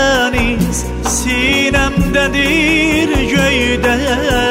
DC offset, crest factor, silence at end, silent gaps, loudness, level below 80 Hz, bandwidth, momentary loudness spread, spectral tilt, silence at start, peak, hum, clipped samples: under 0.1%; 12 dB; 0 s; none; -13 LUFS; -24 dBFS; 16.5 kHz; 5 LU; -4 dB/octave; 0 s; -2 dBFS; none; under 0.1%